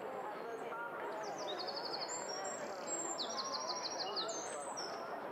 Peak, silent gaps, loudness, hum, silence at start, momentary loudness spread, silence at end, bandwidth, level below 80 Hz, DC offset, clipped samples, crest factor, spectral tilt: -28 dBFS; none; -41 LUFS; none; 0 s; 5 LU; 0 s; 16 kHz; -86 dBFS; under 0.1%; under 0.1%; 14 dB; -1 dB/octave